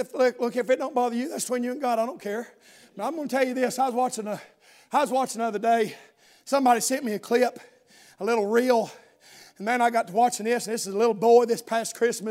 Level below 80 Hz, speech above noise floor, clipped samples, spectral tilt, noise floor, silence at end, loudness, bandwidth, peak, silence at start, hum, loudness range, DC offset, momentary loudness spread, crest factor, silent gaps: -84 dBFS; 28 dB; under 0.1%; -3.5 dB/octave; -52 dBFS; 0 s; -25 LUFS; 16 kHz; -8 dBFS; 0 s; none; 4 LU; under 0.1%; 11 LU; 18 dB; none